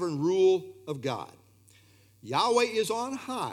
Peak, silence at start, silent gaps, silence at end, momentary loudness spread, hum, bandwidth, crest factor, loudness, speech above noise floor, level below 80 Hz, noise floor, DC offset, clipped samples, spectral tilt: -12 dBFS; 0 s; none; 0 s; 13 LU; none; 14.5 kHz; 18 dB; -28 LUFS; 32 dB; -78 dBFS; -60 dBFS; under 0.1%; under 0.1%; -4.5 dB/octave